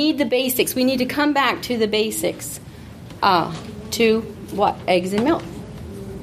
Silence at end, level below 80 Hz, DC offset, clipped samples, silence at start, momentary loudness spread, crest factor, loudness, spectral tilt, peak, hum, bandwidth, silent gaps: 0 s; -48 dBFS; under 0.1%; under 0.1%; 0 s; 16 LU; 18 dB; -20 LUFS; -4 dB/octave; -2 dBFS; none; 15.5 kHz; none